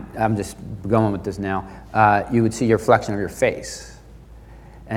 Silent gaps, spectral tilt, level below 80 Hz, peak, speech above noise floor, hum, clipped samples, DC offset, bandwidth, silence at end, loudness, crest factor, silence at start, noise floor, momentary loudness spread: none; -6.5 dB/octave; -44 dBFS; -2 dBFS; 23 dB; none; under 0.1%; under 0.1%; 16 kHz; 0 s; -20 LUFS; 20 dB; 0 s; -43 dBFS; 15 LU